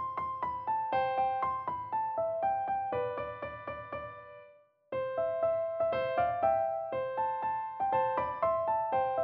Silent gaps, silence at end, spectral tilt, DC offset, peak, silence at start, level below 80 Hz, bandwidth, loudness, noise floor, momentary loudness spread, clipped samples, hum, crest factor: none; 0 s; -8 dB/octave; under 0.1%; -18 dBFS; 0 s; -64 dBFS; 5.2 kHz; -33 LUFS; -60 dBFS; 11 LU; under 0.1%; none; 16 dB